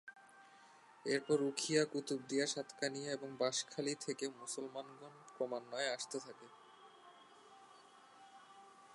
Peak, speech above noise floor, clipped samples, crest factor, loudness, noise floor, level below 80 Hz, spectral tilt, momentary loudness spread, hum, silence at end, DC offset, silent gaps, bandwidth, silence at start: -20 dBFS; 23 dB; under 0.1%; 24 dB; -40 LUFS; -63 dBFS; under -90 dBFS; -3 dB/octave; 25 LU; none; 0 s; under 0.1%; none; 11.5 kHz; 0.05 s